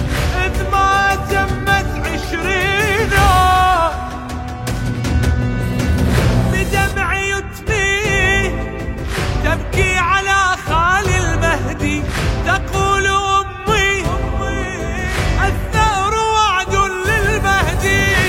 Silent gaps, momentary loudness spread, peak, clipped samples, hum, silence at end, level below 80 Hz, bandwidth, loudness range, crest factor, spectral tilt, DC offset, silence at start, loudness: none; 8 LU; -2 dBFS; under 0.1%; none; 0 s; -24 dBFS; 16.5 kHz; 2 LU; 14 dB; -4.5 dB/octave; under 0.1%; 0 s; -16 LUFS